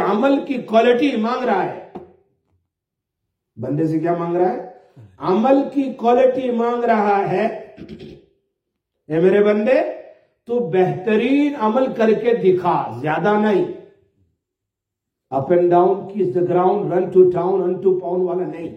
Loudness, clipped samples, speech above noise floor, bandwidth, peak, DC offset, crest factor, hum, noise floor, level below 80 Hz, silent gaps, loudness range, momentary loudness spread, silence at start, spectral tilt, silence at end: -18 LUFS; under 0.1%; 65 dB; 6.6 kHz; -2 dBFS; under 0.1%; 16 dB; none; -82 dBFS; -64 dBFS; none; 5 LU; 12 LU; 0 s; -8 dB/octave; 0 s